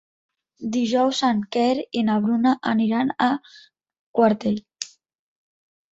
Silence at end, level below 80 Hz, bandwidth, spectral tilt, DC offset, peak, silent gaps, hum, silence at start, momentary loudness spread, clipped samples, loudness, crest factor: 1.05 s; -66 dBFS; 8 kHz; -5 dB/octave; under 0.1%; -6 dBFS; 3.99-4.14 s; none; 0.6 s; 10 LU; under 0.1%; -22 LUFS; 18 dB